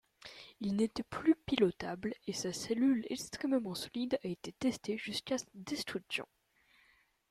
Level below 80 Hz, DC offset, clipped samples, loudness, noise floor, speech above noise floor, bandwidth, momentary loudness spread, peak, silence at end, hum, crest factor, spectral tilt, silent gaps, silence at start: -68 dBFS; under 0.1%; under 0.1%; -36 LUFS; -70 dBFS; 35 dB; 15 kHz; 10 LU; -14 dBFS; 1.05 s; none; 22 dB; -4.5 dB/octave; none; 0.25 s